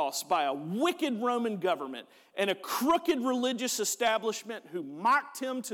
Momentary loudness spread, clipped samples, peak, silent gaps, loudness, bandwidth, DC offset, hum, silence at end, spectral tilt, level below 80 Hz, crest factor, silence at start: 11 LU; under 0.1%; -16 dBFS; none; -30 LUFS; 18.5 kHz; under 0.1%; none; 0 s; -3 dB/octave; -74 dBFS; 14 dB; 0 s